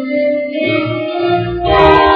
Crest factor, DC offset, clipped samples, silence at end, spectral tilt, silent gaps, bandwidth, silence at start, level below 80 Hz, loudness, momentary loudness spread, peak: 12 dB; under 0.1%; 0.2%; 0 s; -8 dB/octave; none; 7.2 kHz; 0 s; -30 dBFS; -13 LUFS; 8 LU; 0 dBFS